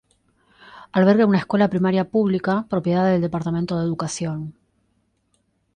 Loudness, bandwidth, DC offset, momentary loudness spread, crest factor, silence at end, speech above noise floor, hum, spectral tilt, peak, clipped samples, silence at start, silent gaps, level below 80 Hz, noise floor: -20 LUFS; 9.8 kHz; under 0.1%; 9 LU; 16 dB; 1.25 s; 48 dB; none; -7 dB/octave; -6 dBFS; under 0.1%; 0.75 s; none; -56 dBFS; -67 dBFS